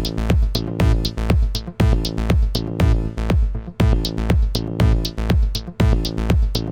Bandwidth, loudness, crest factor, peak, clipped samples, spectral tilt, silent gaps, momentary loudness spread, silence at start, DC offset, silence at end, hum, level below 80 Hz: 17 kHz; -20 LUFS; 16 dB; -2 dBFS; under 0.1%; -6.5 dB/octave; none; 4 LU; 0 s; under 0.1%; 0 s; none; -20 dBFS